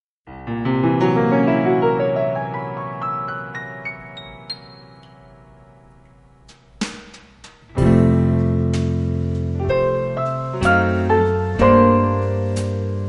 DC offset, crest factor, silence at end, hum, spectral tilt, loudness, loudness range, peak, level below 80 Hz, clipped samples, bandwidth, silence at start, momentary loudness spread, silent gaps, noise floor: under 0.1%; 18 dB; 0 s; none; -8 dB/octave; -19 LUFS; 18 LU; -2 dBFS; -38 dBFS; under 0.1%; 11.5 kHz; 0.25 s; 15 LU; none; -49 dBFS